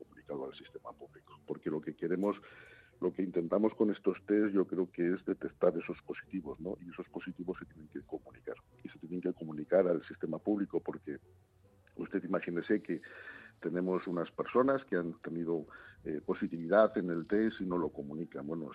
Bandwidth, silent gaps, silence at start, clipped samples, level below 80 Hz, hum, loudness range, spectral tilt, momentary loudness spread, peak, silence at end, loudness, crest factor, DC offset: 5 kHz; none; 0 s; under 0.1%; -70 dBFS; none; 6 LU; -9.5 dB/octave; 18 LU; -12 dBFS; 0 s; -35 LUFS; 22 dB; under 0.1%